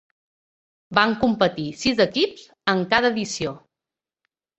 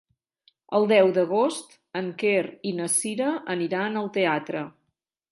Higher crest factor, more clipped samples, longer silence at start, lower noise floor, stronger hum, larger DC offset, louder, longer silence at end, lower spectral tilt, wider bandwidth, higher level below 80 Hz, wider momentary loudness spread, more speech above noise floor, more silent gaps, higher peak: about the same, 22 dB vs 20 dB; neither; first, 0.9 s vs 0.7 s; first, -89 dBFS vs -78 dBFS; neither; neither; about the same, -22 LUFS vs -24 LUFS; first, 1 s vs 0.6 s; about the same, -4 dB/octave vs -4 dB/octave; second, 8.2 kHz vs 12 kHz; first, -56 dBFS vs -78 dBFS; second, 8 LU vs 14 LU; first, 68 dB vs 54 dB; neither; first, -2 dBFS vs -6 dBFS